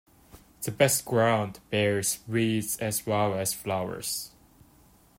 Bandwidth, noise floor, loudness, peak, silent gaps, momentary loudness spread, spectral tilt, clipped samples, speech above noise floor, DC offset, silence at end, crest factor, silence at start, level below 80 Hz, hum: 16.5 kHz; -59 dBFS; -27 LUFS; -8 dBFS; none; 9 LU; -4 dB/octave; under 0.1%; 31 dB; under 0.1%; 0.9 s; 20 dB; 0.35 s; -62 dBFS; none